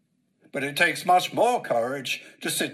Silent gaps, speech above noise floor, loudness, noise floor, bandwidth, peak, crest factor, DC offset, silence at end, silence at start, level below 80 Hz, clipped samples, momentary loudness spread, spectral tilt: none; 38 dB; -24 LUFS; -63 dBFS; 15.5 kHz; -6 dBFS; 20 dB; under 0.1%; 0 s; 0.55 s; -78 dBFS; under 0.1%; 10 LU; -2.5 dB/octave